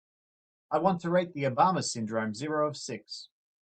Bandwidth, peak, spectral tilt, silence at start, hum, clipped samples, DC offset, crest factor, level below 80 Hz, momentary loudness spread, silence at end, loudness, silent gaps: 9.2 kHz; -12 dBFS; -5 dB/octave; 0.7 s; none; under 0.1%; under 0.1%; 20 dB; -74 dBFS; 13 LU; 0.35 s; -29 LUFS; none